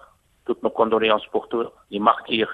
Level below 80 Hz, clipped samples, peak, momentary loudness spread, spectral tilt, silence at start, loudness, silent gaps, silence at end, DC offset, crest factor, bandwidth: -60 dBFS; under 0.1%; -2 dBFS; 10 LU; -6.5 dB/octave; 0.5 s; -22 LUFS; none; 0 s; under 0.1%; 22 dB; 4.8 kHz